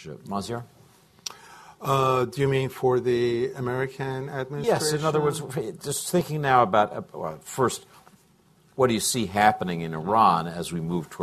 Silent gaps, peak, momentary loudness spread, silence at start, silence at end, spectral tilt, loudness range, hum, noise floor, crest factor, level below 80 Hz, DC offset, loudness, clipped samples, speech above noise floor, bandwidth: none; -4 dBFS; 14 LU; 0 s; 0 s; -5 dB/octave; 2 LU; none; -60 dBFS; 22 dB; -56 dBFS; under 0.1%; -25 LUFS; under 0.1%; 35 dB; 14 kHz